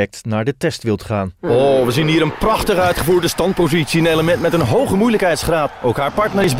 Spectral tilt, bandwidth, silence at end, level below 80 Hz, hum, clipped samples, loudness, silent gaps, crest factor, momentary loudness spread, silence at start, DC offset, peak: -5.5 dB/octave; 16.5 kHz; 0 s; -36 dBFS; none; under 0.1%; -16 LUFS; none; 12 dB; 6 LU; 0 s; 0.5%; -4 dBFS